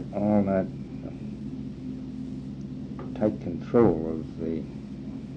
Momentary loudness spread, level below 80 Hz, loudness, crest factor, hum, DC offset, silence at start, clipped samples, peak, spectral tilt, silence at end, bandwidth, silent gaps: 15 LU; -50 dBFS; -29 LUFS; 20 dB; none; under 0.1%; 0 s; under 0.1%; -8 dBFS; -10 dB/octave; 0 s; 7.2 kHz; none